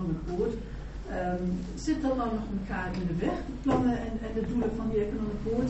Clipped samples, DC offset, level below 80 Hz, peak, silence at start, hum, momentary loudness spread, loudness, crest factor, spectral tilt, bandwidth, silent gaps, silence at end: under 0.1%; under 0.1%; -40 dBFS; -14 dBFS; 0 s; none; 6 LU; -31 LUFS; 16 dB; -7 dB/octave; 8 kHz; none; 0 s